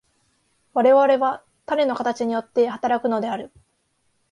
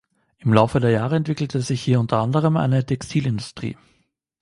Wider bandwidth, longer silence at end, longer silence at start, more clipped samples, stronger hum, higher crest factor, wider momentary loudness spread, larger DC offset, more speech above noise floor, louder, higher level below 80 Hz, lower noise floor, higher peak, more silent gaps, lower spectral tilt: about the same, 10.5 kHz vs 11.5 kHz; first, 0.85 s vs 0.7 s; first, 0.75 s vs 0.45 s; neither; neither; about the same, 16 dB vs 20 dB; first, 13 LU vs 10 LU; neither; about the same, 49 dB vs 47 dB; about the same, -21 LUFS vs -21 LUFS; second, -68 dBFS vs -50 dBFS; about the same, -69 dBFS vs -66 dBFS; second, -6 dBFS vs 0 dBFS; neither; second, -5.5 dB/octave vs -7 dB/octave